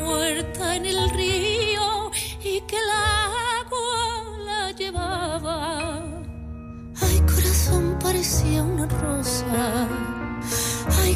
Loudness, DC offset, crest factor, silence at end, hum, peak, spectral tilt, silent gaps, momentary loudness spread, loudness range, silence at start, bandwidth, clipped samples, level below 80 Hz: -23 LUFS; under 0.1%; 14 dB; 0 s; none; -8 dBFS; -4 dB/octave; none; 9 LU; 5 LU; 0 s; 15.5 kHz; under 0.1%; -30 dBFS